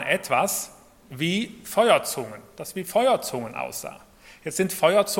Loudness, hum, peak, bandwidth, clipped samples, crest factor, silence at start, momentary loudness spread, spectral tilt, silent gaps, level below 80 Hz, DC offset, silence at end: -24 LUFS; none; -2 dBFS; 17.5 kHz; under 0.1%; 22 dB; 0 s; 18 LU; -3.5 dB/octave; none; -62 dBFS; under 0.1%; 0 s